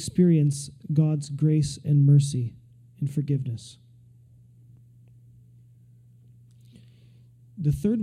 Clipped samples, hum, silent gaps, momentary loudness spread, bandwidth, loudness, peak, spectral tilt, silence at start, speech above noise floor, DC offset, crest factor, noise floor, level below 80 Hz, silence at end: under 0.1%; none; none; 15 LU; 11.5 kHz; -24 LUFS; -10 dBFS; -8 dB/octave; 0 s; 31 dB; under 0.1%; 16 dB; -54 dBFS; -54 dBFS; 0 s